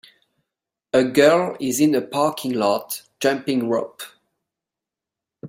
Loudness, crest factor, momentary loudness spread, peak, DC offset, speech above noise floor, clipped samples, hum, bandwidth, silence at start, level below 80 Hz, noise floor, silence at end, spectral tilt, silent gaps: -20 LUFS; 20 dB; 14 LU; -2 dBFS; under 0.1%; 68 dB; under 0.1%; none; 16.5 kHz; 0.95 s; -66 dBFS; -87 dBFS; 0 s; -4.5 dB/octave; none